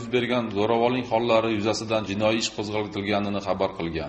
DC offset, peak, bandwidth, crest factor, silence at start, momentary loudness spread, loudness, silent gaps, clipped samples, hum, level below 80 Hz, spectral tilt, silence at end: under 0.1%; -8 dBFS; 8.4 kHz; 16 dB; 0 s; 5 LU; -25 LUFS; none; under 0.1%; none; -54 dBFS; -5 dB/octave; 0 s